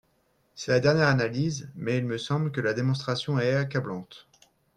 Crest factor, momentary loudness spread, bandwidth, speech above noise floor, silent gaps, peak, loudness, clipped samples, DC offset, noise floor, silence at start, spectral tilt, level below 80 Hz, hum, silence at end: 20 dB; 12 LU; 10 kHz; 42 dB; none; -8 dBFS; -26 LUFS; under 0.1%; under 0.1%; -69 dBFS; 0.55 s; -6 dB/octave; -62 dBFS; none; 0.6 s